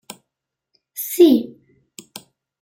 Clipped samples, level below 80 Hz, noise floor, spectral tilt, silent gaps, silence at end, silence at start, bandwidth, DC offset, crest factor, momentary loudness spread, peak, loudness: under 0.1%; -68 dBFS; -82 dBFS; -4 dB/octave; none; 1.1 s; 0.95 s; 16.5 kHz; under 0.1%; 20 dB; 26 LU; -2 dBFS; -16 LUFS